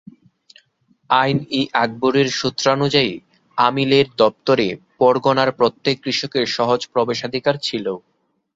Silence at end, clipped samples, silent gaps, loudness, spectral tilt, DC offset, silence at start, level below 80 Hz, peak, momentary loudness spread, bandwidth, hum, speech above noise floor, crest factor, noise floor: 0.55 s; under 0.1%; none; -18 LUFS; -5 dB/octave; under 0.1%; 1.1 s; -58 dBFS; -2 dBFS; 7 LU; 7.8 kHz; none; 43 dB; 18 dB; -61 dBFS